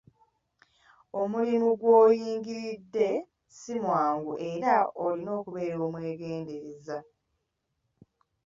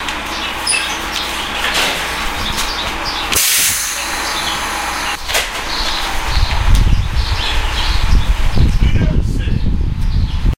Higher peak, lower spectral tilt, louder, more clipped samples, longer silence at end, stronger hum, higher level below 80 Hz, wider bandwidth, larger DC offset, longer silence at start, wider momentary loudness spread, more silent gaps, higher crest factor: second, -10 dBFS vs 0 dBFS; first, -6.5 dB/octave vs -3 dB/octave; second, -28 LUFS vs -16 LUFS; neither; first, 1.45 s vs 0 s; neither; second, -72 dBFS vs -18 dBFS; second, 7.6 kHz vs 16.5 kHz; neither; first, 1.15 s vs 0 s; first, 17 LU vs 5 LU; neither; first, 20 dB vs 14 dB